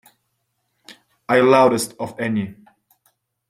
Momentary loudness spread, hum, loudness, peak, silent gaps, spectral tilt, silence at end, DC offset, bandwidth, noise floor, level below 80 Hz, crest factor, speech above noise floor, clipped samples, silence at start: 16 LU; none; -18 LUFS; -2 dBFS; none; -5 dB/octave; 0.95 s; under 0.1%; 15.5 kHz; -72 dBFS; -64 dBFS; 20 dB; 55 dB; under 0.1%; 0.9 s